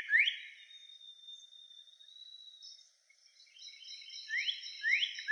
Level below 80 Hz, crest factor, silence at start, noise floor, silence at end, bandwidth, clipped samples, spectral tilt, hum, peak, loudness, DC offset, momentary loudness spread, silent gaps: under -90 dBFS; 22 dB; 0 s; -67 dBFS; 0 s; 10 kHz; under 0.1%; 9.5 dB/octave; none; -18 dBFS; -33 LUFS; under 0.1%; 22 LU; none